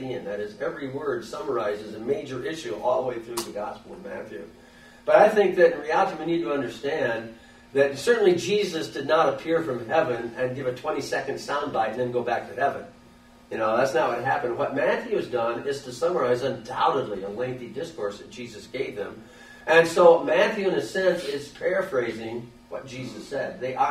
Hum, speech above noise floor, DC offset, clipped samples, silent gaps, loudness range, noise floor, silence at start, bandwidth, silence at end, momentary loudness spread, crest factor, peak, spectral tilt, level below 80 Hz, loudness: none; 27 dB; under 0.1%; under 0.1%; none; 7 LU; -52 dBFS; 0 s; 15 kHz; 0 s; 16 LU; 22 dB; -4 dBFS; -5 dB/octave; -60 dBFS; -25 LUFS